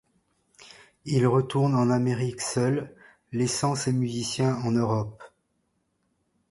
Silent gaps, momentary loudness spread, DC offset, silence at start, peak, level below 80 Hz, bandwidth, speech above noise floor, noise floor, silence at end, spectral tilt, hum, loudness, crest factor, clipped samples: none; 8 LU; under 0.1%; 0.6 s; -10 dBFS; -60 dBFS; 11.5 kHz; 49 dB; -74 dBFS; 1.25 s; -6 dB/octave; none; -26 LUFS; 18 dB; under 0.1%